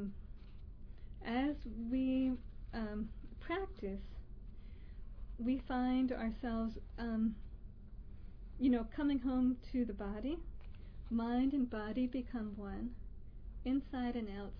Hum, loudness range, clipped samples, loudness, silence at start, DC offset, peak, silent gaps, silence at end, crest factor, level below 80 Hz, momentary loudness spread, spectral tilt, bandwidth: none; 3 LU; under 0.1%; -39 LUFS; 0 s; under 0.1%; -24 dBFS; none; 0 s; 16 dB; -50 dBFS; 21 LU; -6 dB/octave; 5.2 kHz